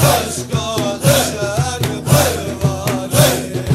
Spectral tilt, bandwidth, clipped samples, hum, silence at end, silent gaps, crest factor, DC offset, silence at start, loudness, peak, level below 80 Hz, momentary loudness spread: -4.5 dB/octave; 16 kHz; under 0.1%; none; 0 s; none; 16 dB; under 0.1%; 0 s; -16 LUFS; 0 dBFS; -36 dBFS; 7 LU